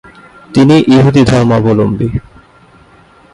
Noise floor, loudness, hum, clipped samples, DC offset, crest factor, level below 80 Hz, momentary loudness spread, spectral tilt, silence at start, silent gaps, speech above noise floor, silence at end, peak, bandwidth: -42 dBFS; -9 LUFS; none; under 0.1%; under 0.1%; 10 dB; -34 dBFS; 10 LU; -7.5 dB/octave; 0.5 s; none; 34 dB; 1.15 s; 0 dBFS; 11 kHz